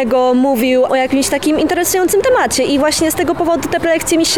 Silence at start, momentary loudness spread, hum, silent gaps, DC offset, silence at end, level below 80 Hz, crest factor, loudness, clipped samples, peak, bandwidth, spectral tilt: 0 s; 3 LU; none; none; 0.8%; 0 s; -42 dBFS; 8 dB; -13 LUFS; under 0.1%; -4 dBFS; 19.5 kHz; -3 dB/octave